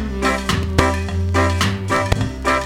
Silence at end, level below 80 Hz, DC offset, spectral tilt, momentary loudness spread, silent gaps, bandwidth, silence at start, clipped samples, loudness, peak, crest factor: 0 s; -28 dBFS; under 0.1%; -5 dB/octave; 3 LU; none; 16 kHz; 0 s; under 0.1%; -19 LUFS; 0 dBFS; 18 dB